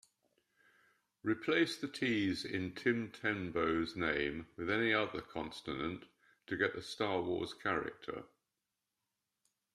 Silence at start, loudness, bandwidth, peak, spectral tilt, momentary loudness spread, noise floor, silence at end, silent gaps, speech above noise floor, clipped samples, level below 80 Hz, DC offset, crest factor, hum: 1.25 s; -37 LUFS; 13 kHz; -18 dBFS; -5.5 dB/octave; 10 LU; -89 dBFS; 1.5 s; none; 52 dB; under 0.1%; -68 dBFS; under 0.1%; 22 dB; none